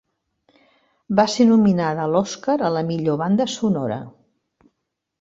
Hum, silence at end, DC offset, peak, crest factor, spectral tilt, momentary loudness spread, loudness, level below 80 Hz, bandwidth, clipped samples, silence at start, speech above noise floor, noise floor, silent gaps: none; 1.1 s; under 0.1%; -2 dBFS; 20 dB; -6 dB/octave; 8 LU; -19 LUFS; -60 dBFS; 8 kHz; under 0.1%; 1.1 s; 58 dB; -77 dBFS; none